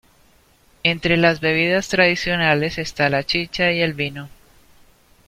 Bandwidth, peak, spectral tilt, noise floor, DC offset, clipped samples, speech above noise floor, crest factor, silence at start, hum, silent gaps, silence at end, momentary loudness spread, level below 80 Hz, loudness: 15.5 kHz; -2 dBFS; -5 dB/octave; -55 dBFS; under 0.1%; under 0.1%; 36 dB; 20 dB; 0.85 s; none; none; 1 s; 7 LU; -48 dBFS; -18 LUFS